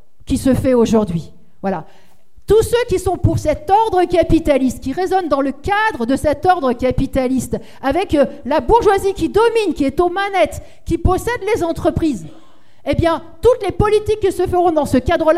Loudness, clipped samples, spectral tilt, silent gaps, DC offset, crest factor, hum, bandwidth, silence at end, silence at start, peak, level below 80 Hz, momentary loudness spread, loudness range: -16 LUFS; under 0.1%; -6 dB/octave; none; 2%; 16 dB; none; 15.5 kHz; 0 s; 0.3 s; 0 dBFS; -32 dBFS; 8 LU; 2 LU